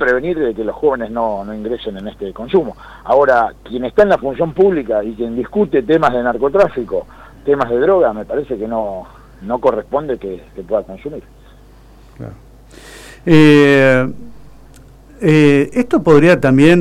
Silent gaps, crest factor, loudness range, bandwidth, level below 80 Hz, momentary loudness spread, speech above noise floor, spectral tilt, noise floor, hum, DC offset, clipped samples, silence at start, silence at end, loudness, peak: none; 14 dB; 10 LU; 13 kHz; -40 dBFS; 18 LU; 28 dB; -7.5 dB/octave; -42 dBFS; none; under 0.1%; under 0.1%; 0 s; 0 s; -14 LUFS; 0 dBFS